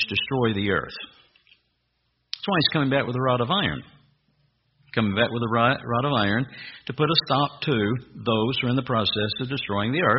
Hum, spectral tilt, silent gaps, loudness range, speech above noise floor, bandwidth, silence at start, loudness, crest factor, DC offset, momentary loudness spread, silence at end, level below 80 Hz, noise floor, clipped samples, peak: none; -3.5 dB/octave; none; 2 LU; 49 dB; 5.8 kHz; 0 s; -24 LUFS; 20 dB; under 0.1%; 11 LU; 0 s; -56 dBFS; -72 dBFS; under 0.1%; -4 dBFS